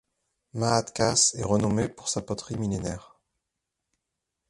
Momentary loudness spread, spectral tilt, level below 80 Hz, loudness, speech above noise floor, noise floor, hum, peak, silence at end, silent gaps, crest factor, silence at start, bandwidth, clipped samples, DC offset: 13 LU; -4 dB/octave; -52 dBFS; -26 LUFS; 58 dB; -84 dBFS; none; -8 dBFS; 1.45 s; none; 22 dB; 0.55 s; 11.5 kHz; under 0.1%; under 0.1%